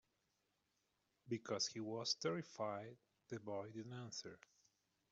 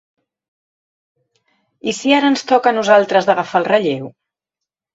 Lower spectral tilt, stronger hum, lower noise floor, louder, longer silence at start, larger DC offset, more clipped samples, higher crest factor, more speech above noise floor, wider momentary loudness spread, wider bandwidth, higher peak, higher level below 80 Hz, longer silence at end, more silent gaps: about the same, -3.5 dB/octave vs -4.5 dB/octave; neither; about the same, -86 dBFS vs -84 dBFS; second, -46 LUFS vs -15 LUFS; second, 1.25 s vs 1.85 s; neither; neither; about the same, 22 dB vs 18 dB; second, 39 dB vs 69 dB; about the same, 12 LU vs 13 LU; about the same, 8 kHz vs 8 kHz; second, -26 dBFS vs 0 dBFS; second, -88 dBFS vs -64 dBFS; about the same, 0.75 s vs 0.85 s; neither